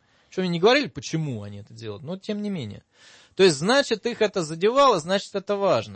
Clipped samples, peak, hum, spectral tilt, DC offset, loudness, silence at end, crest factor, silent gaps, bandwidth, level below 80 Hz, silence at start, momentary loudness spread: under 0.1%; -6 dBFS; none; -4.5 dB/octave; under 0.1%; -23 LUFS; 0 s; 16 dB; none; 8.8 kHz; -62 dBFS; 0.35 s; 17 LU